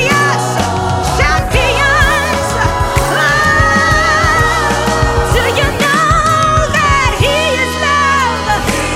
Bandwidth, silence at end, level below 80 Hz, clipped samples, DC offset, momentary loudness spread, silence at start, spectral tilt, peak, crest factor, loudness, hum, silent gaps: 17 kHz; 0 s; -22 dBFS; under 0.1%; under 0.1%; 4 LU; 0 s; -4 dB/octave; 0 dBFS; 12 dB; -11 LUFS; none; none